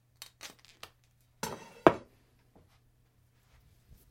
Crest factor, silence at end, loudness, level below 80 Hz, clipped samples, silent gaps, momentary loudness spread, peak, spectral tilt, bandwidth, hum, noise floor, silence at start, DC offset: 36 dB; 2.1 s; -30 LUFS; -64 dBFS; under 0.1%; none; 26 LU; 0 dBFS; -5 dB/octave; 16.5 kHz; none; -68 dBFS; 0.45 s; under 0.1%